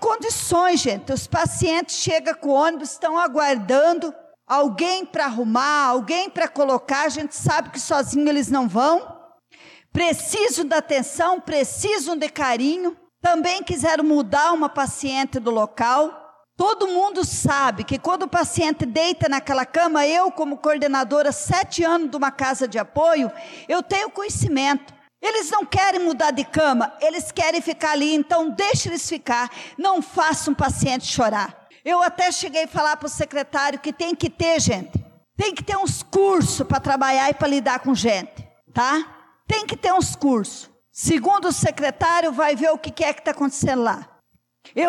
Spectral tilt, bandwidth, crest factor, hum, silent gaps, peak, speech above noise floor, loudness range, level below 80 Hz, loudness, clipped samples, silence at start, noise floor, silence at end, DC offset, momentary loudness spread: -4 dB/octave; 14.5 kHz; 12 dB; none; none; -10 dBFS; 43 dB; 2 LU; -50 dBFS; -21 LUFS; under 0.1%; 0 s; -63 dBFS; 0 s; under 0.1%; 6 LU